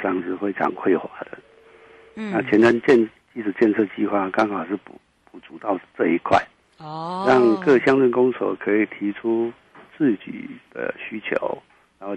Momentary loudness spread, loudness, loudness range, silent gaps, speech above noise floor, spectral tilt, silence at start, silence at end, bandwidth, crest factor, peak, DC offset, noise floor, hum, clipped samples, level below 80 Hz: 18 LU; -21 LUFS; 5 LU; none; 28 dB; -7 dB/octave; 0 s; 0 s; 8.6 kHz; 18 dB; -4 dBFS; under 0.1%; -49 dBFS; none; under 0.1%; -62 dBFS